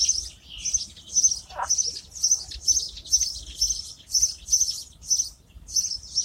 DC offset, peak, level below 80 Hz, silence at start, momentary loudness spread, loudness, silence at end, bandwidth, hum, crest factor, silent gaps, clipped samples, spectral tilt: under 0.1%; -8 dBFS; -48 dBFS; 0 s; 7 LU; -23 LUFS; 0 s; 16 kHz; none; 20 dB; none; under 0.1%; 2 dB/octave